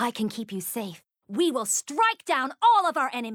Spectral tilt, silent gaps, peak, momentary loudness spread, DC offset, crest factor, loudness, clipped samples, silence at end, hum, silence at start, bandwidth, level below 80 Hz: -2.5 dB/octave; none; -10 dBFS; 13 LU; under 0.1%; 16 dB; -25 LUFS; under 0.1%; 0 s; none; 0 s; 19 kHz; -82 dBFS